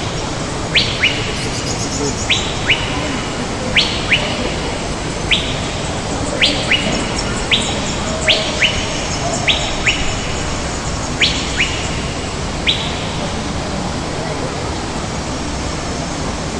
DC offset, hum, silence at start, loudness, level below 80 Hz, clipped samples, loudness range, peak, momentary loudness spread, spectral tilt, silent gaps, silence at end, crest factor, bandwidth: under 0.1%; none; 0 s; -17 LUFS; -30 dBFS; under 0.1%; 5 LU; 0 dBFS; 8 LU; -3 dB/octave; none; 0 s; 18 dB; 11.5 kHz